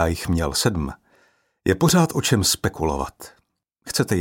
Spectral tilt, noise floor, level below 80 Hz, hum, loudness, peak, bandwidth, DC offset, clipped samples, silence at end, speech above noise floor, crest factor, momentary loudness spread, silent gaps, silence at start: -4.5 dB/octave; -68 dBFS; -38 dBFS; none; -21 LUFS; -4 dBFS; 17 kHz; under 0.1%; under 0.1%; 0 s; 47 dB; 18 dB; 11 LU; none; 0 s